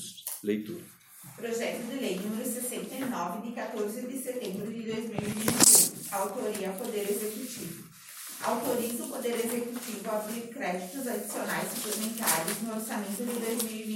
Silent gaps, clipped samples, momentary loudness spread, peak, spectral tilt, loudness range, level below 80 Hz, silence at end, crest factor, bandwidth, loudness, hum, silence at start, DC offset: none; under 0.1%; 10 LU; -6 dBFS; -2.5 dB/octave; 9 LU; -74 dBFS; 0 s; 26 dB; 17 kHz; -29 LUFS; none; 0 s; under 0.1%